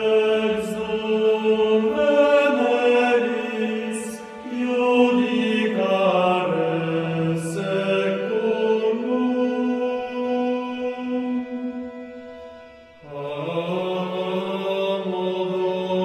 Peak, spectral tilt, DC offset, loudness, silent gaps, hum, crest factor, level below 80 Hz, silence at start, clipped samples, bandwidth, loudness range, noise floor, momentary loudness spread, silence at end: -6 dBFS; -6 dB/octave; under 0.1%; -22 LUFS; none; none; 16 dB; -62 dBFS; 0 s; under 0.1%; 13 kHz; 9 LU; -45 dBFS; 12 LU; 0 s